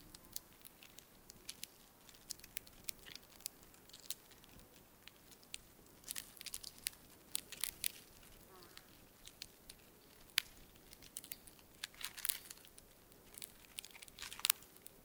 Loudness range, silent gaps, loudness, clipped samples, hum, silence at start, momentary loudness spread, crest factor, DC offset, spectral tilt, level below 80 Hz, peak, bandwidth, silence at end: 6 LU; none; -45 LUFS; under 0.1%; none; 0 s; 20 LU; 44 dB; under 0.1%; 0.5 dB/octave; -72 dBFS; -6 dBFS; 18 kHz; 0 s